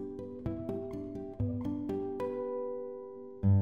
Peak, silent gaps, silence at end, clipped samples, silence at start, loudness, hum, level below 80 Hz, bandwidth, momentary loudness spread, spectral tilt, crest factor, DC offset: -18 dBFS; none; 0 s; under 0.1%; 0 s; -37 LUFS; none; -54 dBFS; 3.7 kHz; 8 LU; -11 dB/octave; 18 dB; 0.1%